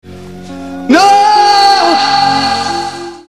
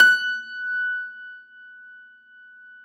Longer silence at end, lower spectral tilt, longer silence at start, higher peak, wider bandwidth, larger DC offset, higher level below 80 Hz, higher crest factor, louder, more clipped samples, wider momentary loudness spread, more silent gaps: second, 0.1 s vs 0.9 s; first, -3 dB/octave vs 1.5 dB/octave; about the same, 0.05 s vs 0 s; about the same, 0 dBFS vs -2 dBFS; second, 13 kHz vs 16.5 kHz; first, 0.9% vs under 0.1%; first, -50 dBFS vs under -90 dBFS; second, 10 dB vs 22 dB; first, -8 LUFS vs -23 LUFS; first, 0.3% vs under 0.1%; second, 19 LU vs 23 LU; neither